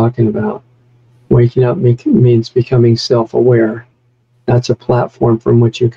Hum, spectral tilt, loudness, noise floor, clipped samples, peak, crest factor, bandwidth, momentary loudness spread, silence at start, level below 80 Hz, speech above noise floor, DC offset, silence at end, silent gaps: none; -8 dB/octave; -12 LUFS; -55 dBFS; under 0.1%; 0 dBFS; 10 dB; 7.4 kHz; 7 LU; 0 s; -42 dBFS; 44 dB; 0.2%; 0.05 s; none